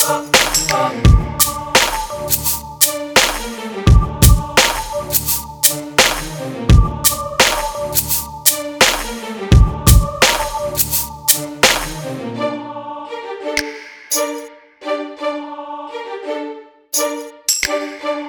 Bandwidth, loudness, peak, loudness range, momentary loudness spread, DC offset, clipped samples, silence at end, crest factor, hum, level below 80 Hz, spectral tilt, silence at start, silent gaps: over 20 kHz; -15 LUFS; 0 dBFS; 9 LU; 14 LU; under 0.1%; under 0.1%; 0 s; 16 dB; none; -22 dBFS; -3 dB/octave; 0 s; none